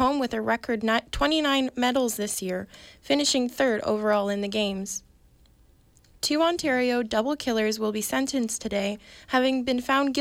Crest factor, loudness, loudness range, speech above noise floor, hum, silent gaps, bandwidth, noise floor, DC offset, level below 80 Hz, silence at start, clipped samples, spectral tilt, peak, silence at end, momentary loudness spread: 14 dB; -25 LUFS; 2 LU; 33 dB; none; none; 16.5 kHz; -58 dBFS; under 0.1%; -50 dBFS; 0 s; under 0.1%; -3 dB/octave; -12 dBFS; 0 s; 7 LU